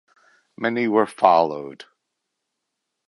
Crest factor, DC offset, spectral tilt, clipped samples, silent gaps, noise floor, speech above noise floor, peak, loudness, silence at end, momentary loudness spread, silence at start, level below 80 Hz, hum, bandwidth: 22 dB; under 0.1%; -6 dB/octave; under 0.1%; none; -80 dBFS; 60 dB; 0 dBFS; -20 LUFS; 1.35 s; 15 LU; 0.6 s; -70 dBFS; none; 11.5 kHz